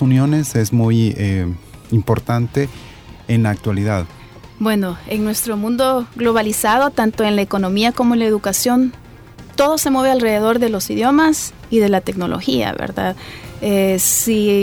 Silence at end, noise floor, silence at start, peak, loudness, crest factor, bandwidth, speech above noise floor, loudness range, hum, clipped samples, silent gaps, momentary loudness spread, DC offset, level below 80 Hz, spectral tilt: 0 s; -38 dBFS; 0 s; -2 dBFS; -17 LUFS; 16 dB; 19.5 kHz; 22 dB; 4 LU; none; under 0.1%; none; 8 LU; under 0.1%; -44 dBFS; -5 dB/octave